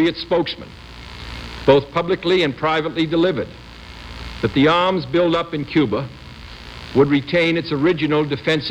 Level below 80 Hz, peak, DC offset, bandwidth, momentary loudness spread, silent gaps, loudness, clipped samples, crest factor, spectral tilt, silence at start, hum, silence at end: -42 dBFS; -2 dBFS; under 0.1%; 10 kHz; 20 LU; none; -18 LUFS; under 0.1%; 18 dB; -6.5 dB/octave; 0 s; none; 0 s